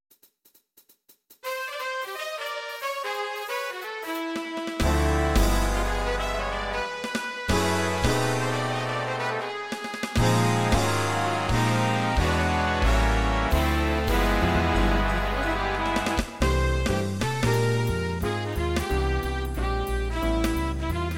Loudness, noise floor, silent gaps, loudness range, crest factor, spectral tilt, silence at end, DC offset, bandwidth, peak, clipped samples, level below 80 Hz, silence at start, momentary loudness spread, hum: -26 LUFS; -63 dBFS; none; 7 LU; 16 dB; -5 dB/octave; 0 s; under 0.1%; 17 kHz; -8 dBFS; under 0.1%; -30 dBFS; 0.1 s; 8 LU; none